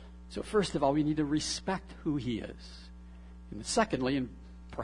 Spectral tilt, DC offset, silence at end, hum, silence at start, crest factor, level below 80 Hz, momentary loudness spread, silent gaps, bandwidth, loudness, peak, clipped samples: -5 dB/octave; under 0.1%; 0 s; none; 0 s; 22 dB; -50 dBFS; 22 LU; none; 11 kHz; -32 LUFS; -12 dBFS; under 0.1%